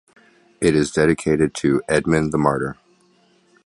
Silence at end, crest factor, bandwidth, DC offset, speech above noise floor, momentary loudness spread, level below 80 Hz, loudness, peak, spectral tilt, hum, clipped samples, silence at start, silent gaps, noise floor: 0.9 s; 18 dB; 11.5 kHz; under 0.1%; 39 dB; 4 LU; -44 dBFS; -19 LUFS; -2 dBFS; -6 dB/octave; none; under 0.1%; 0.6 s; none; -58 dBFS